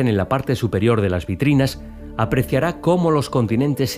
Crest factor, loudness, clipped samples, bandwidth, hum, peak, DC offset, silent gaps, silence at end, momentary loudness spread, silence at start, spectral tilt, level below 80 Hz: 14 dB; -19 LUFS; under 0.1%; 16 kHz; none; -4 dBFS; under 0.1%; none; 0 s; 5 LU; 0 s; -7 dB/octave; -40 dBFS